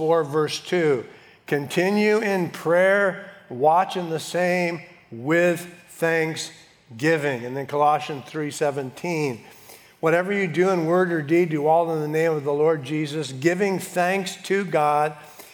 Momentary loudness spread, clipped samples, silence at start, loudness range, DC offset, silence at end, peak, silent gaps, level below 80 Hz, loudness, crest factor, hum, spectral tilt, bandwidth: 10 LU; under 0.1%; 0 s; 3 LU; under 0.1%; 0.1 s; -4 dBFS; none; -76 dBFS; -22 LUFS; 18 dB; none; -5.5 dB/octave; 19.5 kHz